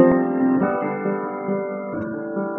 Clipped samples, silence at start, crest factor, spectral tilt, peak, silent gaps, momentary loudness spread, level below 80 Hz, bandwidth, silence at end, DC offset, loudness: under 0.1%; 0 s; 20 dB; -12.5 dB/octave; -2 dBFS; none; 9 LU; -58 dBFS; 3 kHz; 0 s; under 0.1%; -23 LUFS